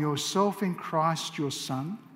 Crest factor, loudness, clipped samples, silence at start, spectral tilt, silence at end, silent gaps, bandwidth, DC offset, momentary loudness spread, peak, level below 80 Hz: 18 dB; -29 LUFS; under 0.1%; 0 s; -4.5 dB/octave; 0 s; none; 16 kHz; under 0.1%; 6 LU; -12 dBFS; -74 dBFS